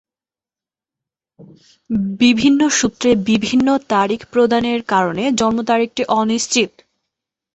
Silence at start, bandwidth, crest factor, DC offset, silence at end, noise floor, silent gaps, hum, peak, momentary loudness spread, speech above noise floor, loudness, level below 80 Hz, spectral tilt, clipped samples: 1.4 s; 8.4 kHz; 16 dB; under 0.1%; 0.9 s; under -90 dBFS; none; none; -2 dBFS; 4 LU; over 74 dB; -16 LUFS; -52 dBFS; -4 dB/octave; under 0.1%